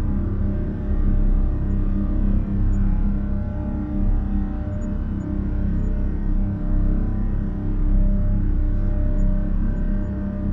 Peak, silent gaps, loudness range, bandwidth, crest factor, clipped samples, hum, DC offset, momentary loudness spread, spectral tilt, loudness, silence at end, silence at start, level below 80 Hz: -8 dBFS; none; 2 LU; 2.3 kHz; 12 dB; under 0.1%; none; under 0.1%; 4 LU; -11 dB/octave; -25 LUFS; 0 s; 0 s; -20 dBFS